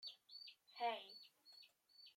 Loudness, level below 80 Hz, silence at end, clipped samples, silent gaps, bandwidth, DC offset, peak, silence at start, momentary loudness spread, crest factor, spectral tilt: -50 LUFS; under -90 dBFS; 0.05 s; under 0.1%; none; 16.5 kHz; under 0.1%; -32 dBFS; 0 s; 19 LU; 20 dB; -1.5 dB/octave